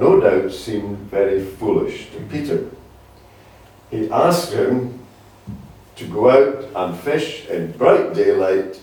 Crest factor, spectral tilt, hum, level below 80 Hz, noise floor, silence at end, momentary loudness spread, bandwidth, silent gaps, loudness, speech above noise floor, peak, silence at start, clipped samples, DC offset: 18 dB; -6 dB/octave; none; -50 dBFS; -46 dBFS; 0 s; 18 LU; 19 kHz; none; -18 LUFS; 28 dB; 0 dBFS; 0 s; under 0.1%; under 0.1%